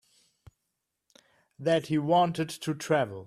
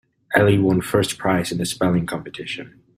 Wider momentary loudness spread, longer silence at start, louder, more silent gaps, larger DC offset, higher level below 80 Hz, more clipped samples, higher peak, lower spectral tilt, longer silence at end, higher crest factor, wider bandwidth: second, 9 LU vs 13 LU; first, 1.6 s vs 0.3 s; second, -28 LUFS vs -20 LUFS; neither; neither; second, -68 dBFS vs -50 dBFS; neither; second, -12 dBFS vs -2 dBFS; about the same, -5.5 dB/octave vs -5.5 dB/octave; second, 0 s vs 0.3 s; about the same, 18 dB vs 18 dB; second, 14.5 kHz vs 16 kHz